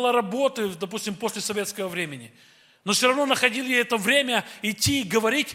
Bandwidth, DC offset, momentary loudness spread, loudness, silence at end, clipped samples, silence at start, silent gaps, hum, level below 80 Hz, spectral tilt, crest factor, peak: 16.5 kHz; under 0.1%; 10 LU; -23 LUFS; 0 s; under 0.1%; 0 s; none; none; -60 dBFS; -3 dB/octave; 20 dB; -4 dBFS